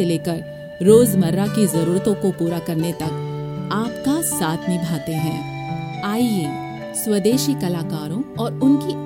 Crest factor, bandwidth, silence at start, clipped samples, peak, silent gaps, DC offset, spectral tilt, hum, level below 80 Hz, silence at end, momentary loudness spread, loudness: 20 dB; 17 kHz; 0 s; under 0.1%; 0 dBFS; none; under 0.1%; -6 dB/octave; none; -52 dBFS; 0 s; 10 LU; -20 LUFS